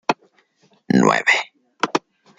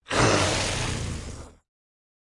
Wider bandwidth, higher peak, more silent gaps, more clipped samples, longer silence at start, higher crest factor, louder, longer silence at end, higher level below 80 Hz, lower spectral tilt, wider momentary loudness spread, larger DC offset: second, 9.4 kHz vs 11.5 kHz; first, -2 dBFS vs -8 dBFS; neither; neither; about the same, 0.1 s vs 0.1 s; about the same, 20 dB vs 20 dB; first, -19 LUFS vs -24 LUFS; second, 0.4 s vs 0.7 s; second, -64 dBFS vs -40 dBFS; about the same, -4.5 dB/octave vs -3.5 dB/octave; second, 13 LU vs 19 LU; neither